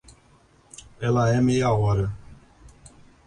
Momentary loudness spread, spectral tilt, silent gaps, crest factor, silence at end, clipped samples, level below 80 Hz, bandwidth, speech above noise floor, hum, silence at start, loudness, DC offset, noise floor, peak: 23 LU; -7 dB/octave; none; 16 dB; 0.4 s; under 0.1%; -46 dBFS; 10.5 kHz; 36 dB; none; 1 s; -23 LUFS; under 0.1%; -57 dBFS; -10 dBFS